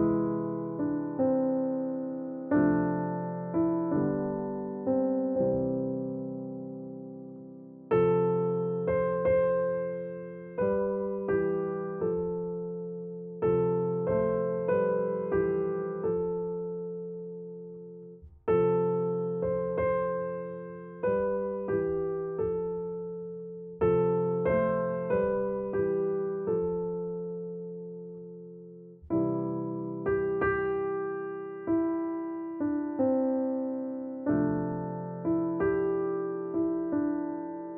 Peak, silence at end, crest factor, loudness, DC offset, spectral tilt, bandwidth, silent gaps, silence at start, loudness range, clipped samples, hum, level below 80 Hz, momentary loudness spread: -16 dBFS; 0 s; 14 dB; -30 LUFS; under 0.1%; -9.5 dB/octave; 3.4 kHz; none; 0 s; 4 LU; under 0.1%; none; -58 dBFS; 13 LU